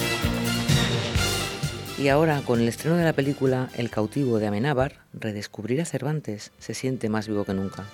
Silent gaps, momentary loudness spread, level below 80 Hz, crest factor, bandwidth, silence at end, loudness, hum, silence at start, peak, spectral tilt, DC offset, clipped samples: none; 9 LU; -44 dBFS; 18 dB; 19 kHz; 0 s; -25 LUFS; none; 0 s; -6 dBFS; -5.5 dB/octave; under 0.1%; under 0.1%